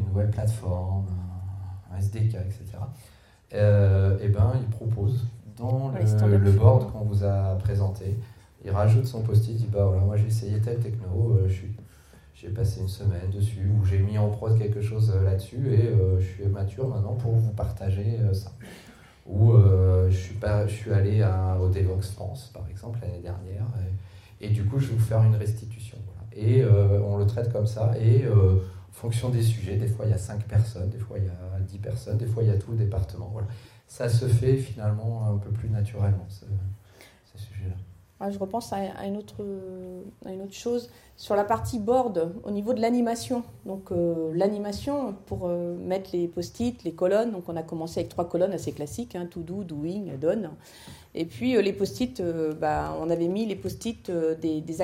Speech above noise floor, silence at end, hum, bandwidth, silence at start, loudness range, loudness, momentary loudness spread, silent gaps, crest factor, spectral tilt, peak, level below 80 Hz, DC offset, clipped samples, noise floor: 29 dB; 0 s; none; 12.5 kHz; 0 s; 8 LU; -26 LUFS; 15 LU; none; 20 dB; -8 dB/octave; -4 dBFS; -50 dBFS; under 0.1%; under 0.1%; -53 dBFS